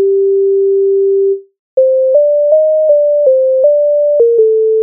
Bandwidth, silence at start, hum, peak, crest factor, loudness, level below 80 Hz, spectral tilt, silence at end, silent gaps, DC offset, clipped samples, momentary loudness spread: 1 kHz; 0 s; none; 0 dBFS; 8 dB; -10 LUFS; -72 dBFS; -7 dB/octave; 0 s; 1.59-1.77 s; under 0.1%; under 0.1%; 3 LU